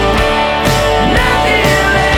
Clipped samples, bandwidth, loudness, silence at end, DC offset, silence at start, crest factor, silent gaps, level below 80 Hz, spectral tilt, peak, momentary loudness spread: under 0.1%; over 20 kHz; -11 LUFS; 0 s; under 0.1%; 0 s; 10 dB; none; -22 dBFS; -4.5 dB/octave; 0 dBFS; 2 LU